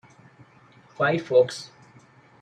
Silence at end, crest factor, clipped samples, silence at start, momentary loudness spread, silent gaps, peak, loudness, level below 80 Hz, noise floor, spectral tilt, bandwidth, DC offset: 0.75 s; 20 dB; under 0.1%; 1 s; 18 LU; none; -8 dBFS; -23 LUFS; -72 dBFS; -54 dBFS; -5.5 dB/octave; 10 kHz; under 0.1%